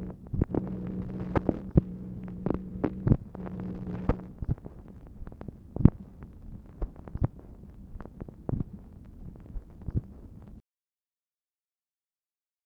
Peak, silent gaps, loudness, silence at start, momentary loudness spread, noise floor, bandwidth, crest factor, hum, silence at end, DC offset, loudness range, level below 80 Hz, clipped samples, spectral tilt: -2 dBFS; none; -32 LUFS; 0 s; 21 LU; under -90 dBFS; 5 kHz; 30 dB; none; 2.05 s; under 0.1%; 12 LU; -40 dBFS; under 0.1%; -11.5 dB/octave